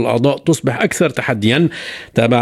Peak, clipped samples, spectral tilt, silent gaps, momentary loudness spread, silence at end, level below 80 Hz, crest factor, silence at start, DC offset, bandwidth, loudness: 0 dBFS; under 0.1%; -5.5 dB/octave; none; 4 LU; 0 s; -52 dBFS; 14 dB; 0 s; under 0.1%; 15 kHz; -16 LUFS